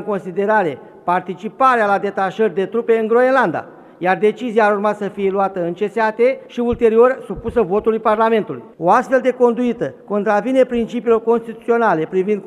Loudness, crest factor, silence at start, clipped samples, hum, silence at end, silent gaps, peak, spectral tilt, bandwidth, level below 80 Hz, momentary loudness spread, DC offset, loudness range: -17 LUFS; 16 dB; 0 s; under 0.1%; none; 0 s; none; -2 dBFS; -7 dB/octave; 10.5 kHz; -48 dBFS; 7 LU; under 0.1%; 1 LU